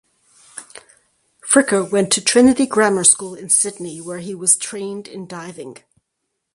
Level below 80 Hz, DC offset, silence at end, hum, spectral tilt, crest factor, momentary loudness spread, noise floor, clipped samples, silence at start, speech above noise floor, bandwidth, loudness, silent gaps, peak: -58 dBFS; under 0.1%; 0.8 s; none; -2.5 dB/octave; 20 dB; 23 LU; -76 dBFS; under 0.1%; 0.55 s; 58 dB; 11.5 kHz; -15 LUFS; none; 0 dBFS